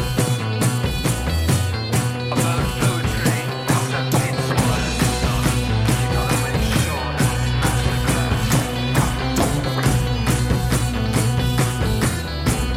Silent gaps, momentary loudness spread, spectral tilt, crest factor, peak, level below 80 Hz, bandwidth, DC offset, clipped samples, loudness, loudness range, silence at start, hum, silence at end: none; 2 LU; -5 dB/octave; 12 dB; -8 dBFS; -28 dBFS; 16.5 kHz; under 0.1%; under 0.1%; -20 LUFS; 1 LU; 0 s; none; 0 s